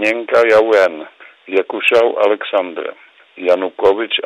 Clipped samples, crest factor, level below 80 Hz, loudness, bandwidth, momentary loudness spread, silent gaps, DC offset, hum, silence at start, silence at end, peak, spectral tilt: under 0.1%; 12 dB; -58 dBFS; -14 LUFS; 13 kHz; 13 LU; none; under 0.1%; none; 0 s; 0.05 s; -2 dBFS; -3.5 dB/octave